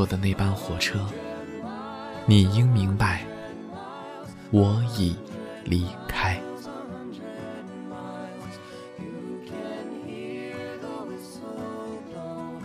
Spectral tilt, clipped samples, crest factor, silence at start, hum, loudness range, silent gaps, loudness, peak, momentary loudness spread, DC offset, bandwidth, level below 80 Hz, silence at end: -6.5 dB/octave; under 0.1%; 24 dB; 0 s; none; 13 LU; none; -28 LUFS; -4 dBFS; 17 LU; under 0.1%; 15 kHz; -48 dBFS; 0 s